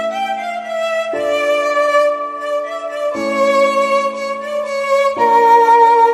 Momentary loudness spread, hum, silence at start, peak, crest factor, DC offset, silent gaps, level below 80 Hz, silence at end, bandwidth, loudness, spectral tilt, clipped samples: 12 LU; none; 0 s; 0 dBFS; 14 dB; under 0.1%; none; -62 dBFS; 0 s; 14.5 kHz; -15 LUFS; -2.5 dB/octave; under 0.1%